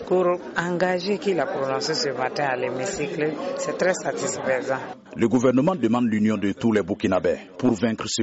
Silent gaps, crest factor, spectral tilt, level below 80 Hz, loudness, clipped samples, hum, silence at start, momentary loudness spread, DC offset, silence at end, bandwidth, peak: none; 14 dB; -4.5 dB/octave; -58 dBFS; -23 LUFS; under 0.1%; none; 0 s; 6 LU; under 0.1%; 0 s; 8 kHz; -8 dBFS